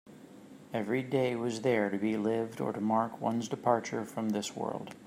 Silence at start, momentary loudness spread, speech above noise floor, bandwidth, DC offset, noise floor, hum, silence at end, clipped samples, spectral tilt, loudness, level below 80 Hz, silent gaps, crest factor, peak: 0.05 s; 8 LU; 20 dB; 16 kHz; under 0.1%; -52 dBFS; none; 0 s; under 0.1%; -6 dB/octave; -32 LUFS; -78 dBFS; none; 20 dB; -12 dBFS